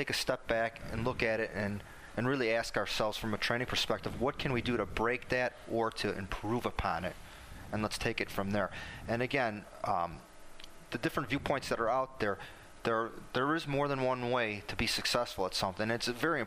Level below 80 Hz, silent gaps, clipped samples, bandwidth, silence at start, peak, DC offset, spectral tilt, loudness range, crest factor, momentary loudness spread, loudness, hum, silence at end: -52 dBFS; none; under 0.1%; 15.5 kHz; 0 s; -14 dBFS; under 0.1%; -4.5 dB/octave; 3 LU; 20 dB; 8 LU; -34 LUFS; none; 0 s